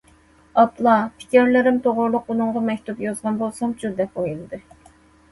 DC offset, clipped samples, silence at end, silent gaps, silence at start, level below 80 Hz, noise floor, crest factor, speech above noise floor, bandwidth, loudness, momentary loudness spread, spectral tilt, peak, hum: under 0.1%; under 0.1%; 0.75 s; none; 0.55 s; -56 dBFS; -53 dBFS; 18 dB; 34 dB; 11.5 kHz; -20 LUFS; 11 LU; -6 dB/octave; -2 dBFS; none